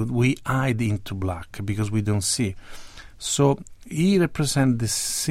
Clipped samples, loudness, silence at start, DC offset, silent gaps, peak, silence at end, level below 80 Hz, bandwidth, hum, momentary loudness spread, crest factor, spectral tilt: under 0.1%; -23 LUFS; 0 s; under 0.1%; none; -6 dBFS; 0 s; -46 dBFS; 16 kHz; none; 11 LU; 16 dB; -5 dB/octave